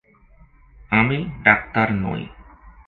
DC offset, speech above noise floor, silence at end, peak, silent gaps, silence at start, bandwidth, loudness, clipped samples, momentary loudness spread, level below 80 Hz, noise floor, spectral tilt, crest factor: under 0.1%; 32 dB; 0.15 s; 0 dBFS; none; 0.9 s; 4.6 kHz; -19 LUFS; under 0.1%; 13 LU; -44 dBFS; -51 dBFS; -9 dB/octave; 22 dB